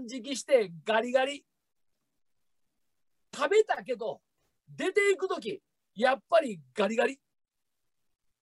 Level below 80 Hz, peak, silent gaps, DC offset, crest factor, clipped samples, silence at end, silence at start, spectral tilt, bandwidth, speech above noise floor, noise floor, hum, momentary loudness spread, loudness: -82 dBFS; -10 dBFS; none; under 0.1%; 20 dB; under 0.1%; 1.25 s; 0 s; -3.5 dB/octave; 12 kHz; 57 dB; -85 dBFS; none; 14 LU; -29 LUFS